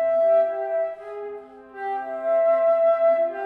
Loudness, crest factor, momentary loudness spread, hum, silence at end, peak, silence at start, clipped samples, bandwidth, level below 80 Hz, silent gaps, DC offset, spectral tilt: -21 LUFS; 10 dB; 16 LU; none; 0 s; -12 dBFS; 0 s; under 0.1%; 3.9 kHz; -70 dBFS; none; under 0.1%; -5.5 dB/octave